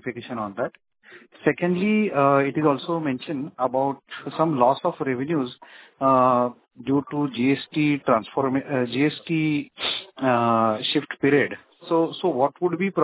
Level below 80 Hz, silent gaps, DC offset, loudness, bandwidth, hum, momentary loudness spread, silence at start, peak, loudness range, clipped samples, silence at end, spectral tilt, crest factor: -64 dBFS; none; under 0.1%; -23 LUFS; 4 kHz; none; 10 LU; 0.05 s; -4 dBFS; 1 LU; under 0.1%; 0 s; -10.5 dB/octave; 20 dB